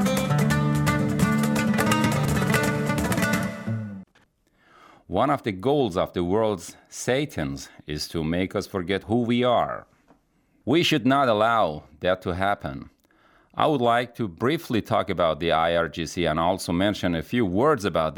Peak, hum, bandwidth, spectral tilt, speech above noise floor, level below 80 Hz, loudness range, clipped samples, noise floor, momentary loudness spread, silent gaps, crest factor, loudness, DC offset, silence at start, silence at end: -6 dBFS; none; 19 kHz; -5.5 dB/octave; 41 dB; -50 dBFS; 4 LU; under 0.1%; -64 dBFS; 10 LU; none; 18 dB; -24 LUFS; under 0.1%; 0 s; 0 s